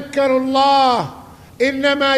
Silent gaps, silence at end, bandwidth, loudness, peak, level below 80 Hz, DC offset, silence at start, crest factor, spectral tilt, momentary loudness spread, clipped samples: none; 0 s; 14.5 kHz; -16 LUFS; -2 dBFS; -52 dBFS; under 0.1%; 0 s; 14 dB; -4 dB/octave; 8 LU; under 0.1%